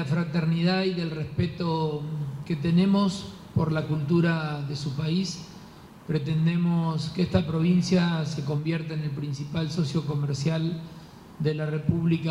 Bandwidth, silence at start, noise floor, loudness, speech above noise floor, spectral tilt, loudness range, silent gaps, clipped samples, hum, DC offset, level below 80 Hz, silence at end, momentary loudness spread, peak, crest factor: 11 kHz; 0 s; -47 dBFS; -27 LUFS; 21 dB; -7 dB/octave; 3 LU; none; under 0.1%; none; under 0.1%; -56 dBFS; 0 s; 9 LU; -8 dBFS; 18 dB